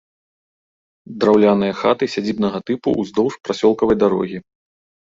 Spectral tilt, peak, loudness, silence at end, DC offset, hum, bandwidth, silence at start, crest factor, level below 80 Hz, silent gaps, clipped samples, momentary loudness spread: -6.5 dB/octave; -2 dBFS; -18 LUFS; 0.65 s; under 0.1%; none; 7.6 kHz; 1.1 s; 18 dB; -52 dBFS; none; under 0.1%; 9 LU